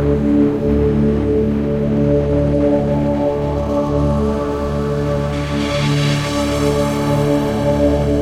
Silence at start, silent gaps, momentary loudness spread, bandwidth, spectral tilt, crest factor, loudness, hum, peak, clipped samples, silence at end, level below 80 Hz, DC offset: 0 s; none; 4 LU; 15 kHz; -7 dB/octave; 12 dB; -16 LUFS; none; -4 dBFS; under 0.1%; 0 s; -26 dBFS; under 0.1%